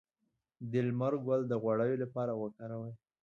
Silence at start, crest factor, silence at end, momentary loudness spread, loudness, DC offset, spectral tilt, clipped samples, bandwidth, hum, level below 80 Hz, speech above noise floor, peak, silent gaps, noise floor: 0.6 s; 16 dB; 0.25 s; 12 LU; -35 LUFS; under 0.1%; -9.5 dB/octave; under 0.1%; 7 kHz; none; -78 dBFS; 49 dB; -20 dBFS; none; -83 dBFS